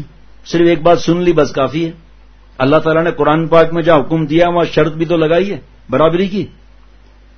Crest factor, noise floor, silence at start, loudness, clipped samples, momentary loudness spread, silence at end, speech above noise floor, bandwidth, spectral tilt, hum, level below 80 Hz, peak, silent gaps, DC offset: 14 dB; -43 dBFS; 0 s; -13 LUFS; under 0.1%; 9 LU; 0.9 s; 31 dB; 6.6 kHz; -7 dB/octave; none; -38 dBFS; 0 dBFS; none; under 0.1%